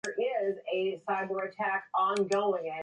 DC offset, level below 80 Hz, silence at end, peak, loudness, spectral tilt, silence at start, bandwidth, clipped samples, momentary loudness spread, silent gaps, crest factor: under 0.1%; -80 dBFS; 0 s; -16 dBFS; -31 LUFS; -4.5 dB/octave; 0.05 s; 10.5 kHz; under 0.1%; 4 LU; none; 14 dB